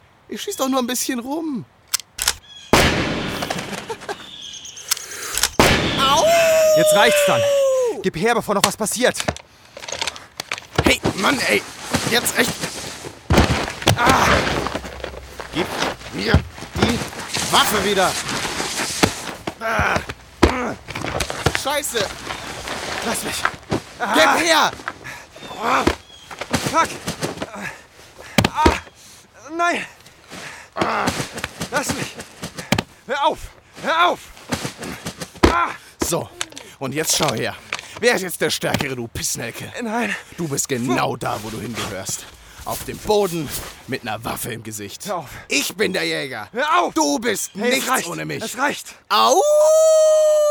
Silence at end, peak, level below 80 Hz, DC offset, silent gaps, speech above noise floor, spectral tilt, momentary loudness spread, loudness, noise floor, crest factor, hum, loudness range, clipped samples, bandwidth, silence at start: 0 s; 0 dBFS; -38 dBFS; under 0.1%; none; 26 dB; -3.5 dB/octave; 16 LU; -20 LUFS; -45 dBFS; 20 dB; none; 7 LU; under 0.1%; over 20 kHz; 0.3 s